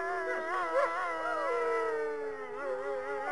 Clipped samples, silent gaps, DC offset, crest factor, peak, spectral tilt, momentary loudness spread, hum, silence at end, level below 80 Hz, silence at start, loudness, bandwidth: under 0.1%; none; 0.3%; 16 dB; -18 dBFS; -3.5 dB/octave; 7 LU; none; 0 s; -72 dBFS; 0 s; -33 LUFS; 11.5 kHz